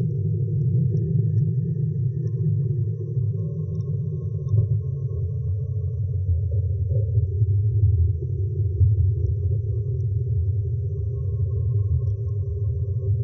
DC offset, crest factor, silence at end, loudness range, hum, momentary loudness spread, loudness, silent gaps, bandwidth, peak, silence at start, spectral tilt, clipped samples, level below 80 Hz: under 0.1%; 14 dB; 0 s; 3 LU; none; 6 LU; -24 LUFS; none; 1.1 kHz; -8 dBFS; 0 s; -16.5 dB/octave; under 0.1%; -38 dBFS